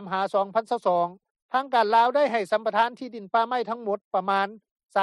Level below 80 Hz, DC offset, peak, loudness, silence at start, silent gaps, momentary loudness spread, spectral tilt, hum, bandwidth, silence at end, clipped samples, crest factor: -80 dBFS; under 0.1%; -8 dBFS; -25 LUFS; 0 s; 1.31-1.35 s, 1.42-1.49 s, 4.04-4.11 s, 4.71-4.76 s; 9 LU; -5 dB/octave; none; 12 kHz; 0 s; under 0.1%; 16 dB